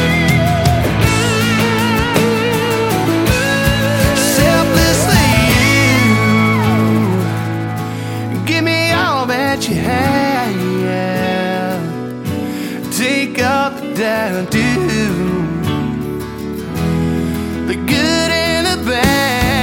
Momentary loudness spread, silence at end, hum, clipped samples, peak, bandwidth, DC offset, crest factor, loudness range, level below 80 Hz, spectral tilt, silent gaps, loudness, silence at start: 9 LU; 0 s; none; under 0.1%; 0 dBFS; 17 kHz; under 0.1%; 14 dB; 6 LU; -30 dBFS; -5 dB/octave; none; -14 LUFS; 0 s